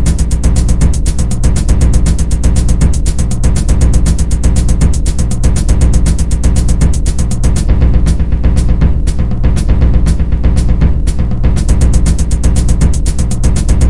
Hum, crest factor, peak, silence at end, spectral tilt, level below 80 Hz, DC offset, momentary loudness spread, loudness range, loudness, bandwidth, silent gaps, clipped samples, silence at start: none; 10 dB; 0 dBFS; 0 s; -6 dB/octave; -10 dBFS; 9%; 3 LU; 0 LU; -12 LUFS; 11.5 kHz; none; 0.2%; 0 s